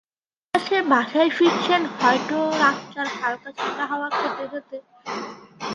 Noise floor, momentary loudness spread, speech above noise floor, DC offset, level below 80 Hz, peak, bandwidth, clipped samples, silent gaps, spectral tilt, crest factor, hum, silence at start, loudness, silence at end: -88 dBFS; 15 LU; 65 dB; under 0.1%; -70 dBFS; -4 dBFS; 11.5 kHz; under 0.1%; none; -4 dB/octave; 20 dB; none; 0.55 s; -22 LUFS; 0 s